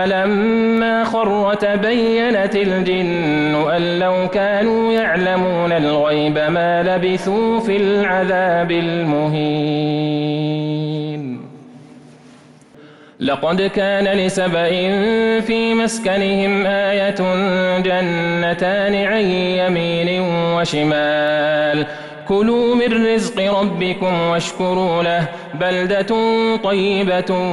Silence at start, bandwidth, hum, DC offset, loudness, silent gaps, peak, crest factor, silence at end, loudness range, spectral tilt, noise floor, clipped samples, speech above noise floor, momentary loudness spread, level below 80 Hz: 0 s; 12 kHz; none; under 0.1%; -17 LUFS; none; -8 dBFS; 10 dB; 0 s; 4 LU; -6 dB/octave; -44 dBFS; under 0.1%; 28 dB; 4 LU; -50 dBFS